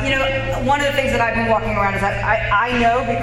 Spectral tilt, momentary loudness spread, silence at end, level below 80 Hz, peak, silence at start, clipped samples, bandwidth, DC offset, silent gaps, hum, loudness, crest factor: -5 dB/octave; 3 LU; 0 s; -32 dBFS; -4 dBFS; 0 s; under 0.1%; 16 kHz; under 0.1%; none; none; -18 LUFS; 14 dB